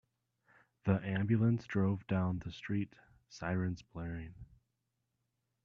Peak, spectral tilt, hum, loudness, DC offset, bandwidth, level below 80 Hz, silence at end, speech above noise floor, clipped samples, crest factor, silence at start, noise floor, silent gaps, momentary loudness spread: -16 dBFS; -8.5 dB/octave; none; -36 LUFS; under 0.1%; 7.2 kHz; -62 dBFS; 1.2 s; 50 dB; under 0.1%; 22 dB; 0.85 s; -85 dBFS; none; 13 LU